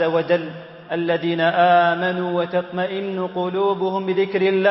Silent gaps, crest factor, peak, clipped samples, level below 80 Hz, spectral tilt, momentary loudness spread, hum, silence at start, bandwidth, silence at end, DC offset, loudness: none; 16 dB; -4 dBFS; under 0.1%; -68 dBFS; -10.5 dB/octave; 10 LU; none; 0 s; 5.8 kHz; 0 s; under 0.1%; -20 LUFS